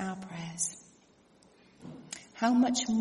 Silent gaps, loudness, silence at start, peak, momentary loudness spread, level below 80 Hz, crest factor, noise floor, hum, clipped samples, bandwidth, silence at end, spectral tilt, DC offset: none; -30 LUFS; 0 s; -16 dBFS; 23 LU; -70 dBFS; 18 dB; -63 dBFS; none; under 0.1%; 11.5 kHz; 0 s; -3.5 dB/octave; under 0.1%